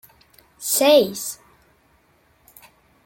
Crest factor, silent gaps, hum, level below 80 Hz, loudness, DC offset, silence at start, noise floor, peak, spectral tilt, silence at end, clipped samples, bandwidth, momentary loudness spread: 22 dB; none; none; -66 dBFS; -19 LUFS; under 0.1%; 0.6 s; -60 dBFS; -2 dBFS; -2 dB/octave; 1.7 s; under 0.1%; 17 kHz; 16 LU